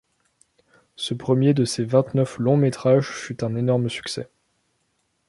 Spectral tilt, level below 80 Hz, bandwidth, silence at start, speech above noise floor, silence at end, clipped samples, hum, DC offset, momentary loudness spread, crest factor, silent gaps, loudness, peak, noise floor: -6.5 dB/octave; -62 dBFS; 11.5 kHz; 1 s; 50 dB; 1.05 s; under 0.1%; none; under 0.1%; 12 LU; 20 dB; none; -22 LUFS; -4 dBFS; -71 dBFS